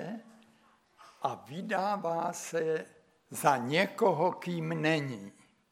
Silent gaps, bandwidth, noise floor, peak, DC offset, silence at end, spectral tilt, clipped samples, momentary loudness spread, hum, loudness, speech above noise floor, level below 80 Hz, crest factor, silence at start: none; 17 kHz; -66 dBFS; -12 dBFS; under 0.1%; 0.4 s; -5 dB/octave; under 0.1%; 15 LU; none; -31 LUFS; 34 dB; -82 dBFS; 22 dB; 0 s